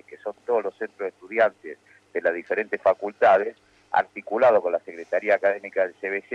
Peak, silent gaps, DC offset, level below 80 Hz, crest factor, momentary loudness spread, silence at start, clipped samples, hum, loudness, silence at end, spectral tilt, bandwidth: -8 dBFS; none; under 0.1%; -74 dBFS; 16 dB; 14 LU; 0.1 s; under 0.1%; none; -24 LUFS; 0 s; -5.5 dB/octave; 7.8 kHz